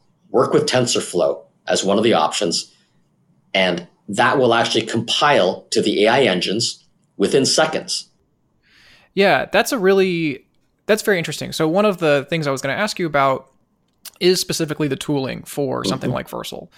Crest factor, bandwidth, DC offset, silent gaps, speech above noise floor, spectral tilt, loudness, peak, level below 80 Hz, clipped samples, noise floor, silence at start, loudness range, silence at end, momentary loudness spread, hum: 18 dB; 16.5 kHz; under 0.1%; none; 45 dB; -4 dB/octave; -18 LUFS; -2 dBFS; -56 dBFS; under 0.1%; -63 dBFS; 0.3 s; 4 LU; 0.1 s; 10 LU; none